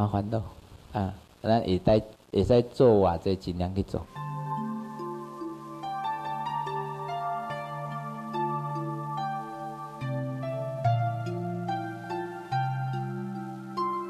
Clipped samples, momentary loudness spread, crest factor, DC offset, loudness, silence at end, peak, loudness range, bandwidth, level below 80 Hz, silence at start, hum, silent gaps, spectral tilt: under 0.1%; 13 LU; 20 dB; under 0.1%; -30 LUFS; 0 s; -8 dBFS; 8 LU; 14 kHz; -48 dBFS; 0 s; none; none; -8 dB/octave